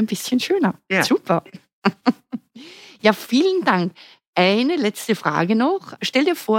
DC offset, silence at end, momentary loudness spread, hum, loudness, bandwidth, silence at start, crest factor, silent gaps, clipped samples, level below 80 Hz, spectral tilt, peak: under 0.1%; 0 s; 7 LU; none; -20 LUFS; 17 kHz; 0 s; 18 dB; 1.73-1.82 s, 4.27-4.33 s; under 0.1%; -72 dBFS; -5 dB/octave; -2 dBFS